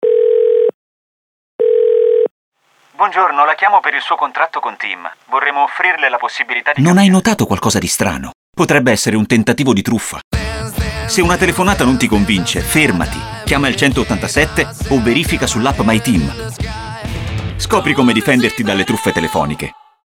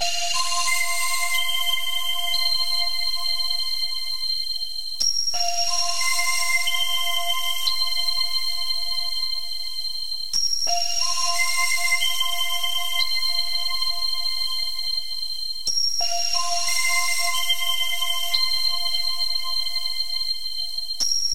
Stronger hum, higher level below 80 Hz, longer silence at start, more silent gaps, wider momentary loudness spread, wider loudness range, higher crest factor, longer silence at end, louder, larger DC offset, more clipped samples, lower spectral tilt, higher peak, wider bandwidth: neither; first, -32 dBFS vs -62 dBFS; about the same, 0 s vs 0 s; first, 0.74-1.59 s, 2.31-2.52 s, 8.35-8.53 s, 10.24-10.31 s vs none; first, 10 LU vs 5 LU; about the same, 2 LU vs 2 LU; about the same, 14 dB vs 18 dB; first, 0.3 s vs 0 s; first, -14 LUFS vs -22 LUFS; second, under 0.1% vs 6%; neither; first, -4.5 dB/octave vs 2.5 dB/octave; first, 0 dBFS vs -6 dBFS; first, 18 kHz vs 16 kHz